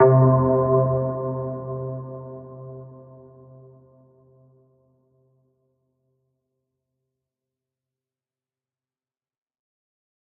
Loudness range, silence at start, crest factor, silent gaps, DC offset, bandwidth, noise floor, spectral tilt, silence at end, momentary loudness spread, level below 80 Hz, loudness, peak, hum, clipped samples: 24 LU; 0 s; 22 dB; none; under 0.1%; 2.3 kHz; under -90 dBFS; -14 dB/octave; 7.3 s; 23 LU; -58 dBFS; -21 LUFS; -4 dBFS; none; under 0.1%